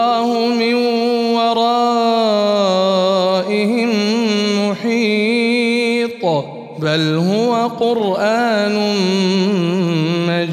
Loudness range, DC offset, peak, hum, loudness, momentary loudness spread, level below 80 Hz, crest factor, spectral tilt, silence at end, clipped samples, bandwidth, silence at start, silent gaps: 2 LU; under 0.1%; -2 dBFS; none; -15 LUFS; 3 LU; -68 dBFS; 12 dB; -5.5 dB/octave; 0 s; under 0.1%; 14 kHz; 0 s; none